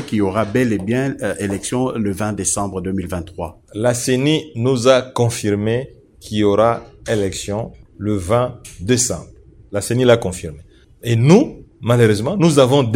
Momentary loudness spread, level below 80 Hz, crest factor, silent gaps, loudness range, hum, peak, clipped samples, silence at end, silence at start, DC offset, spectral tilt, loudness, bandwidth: 13 LU; -44 dBFS; 18 dB; none; 4 LU; none; 0 dBFS; under 0.1%; 0 s; 0 s; under 0.1%; -5.5 dB/octave; -17 LUFS; 16.5 kHz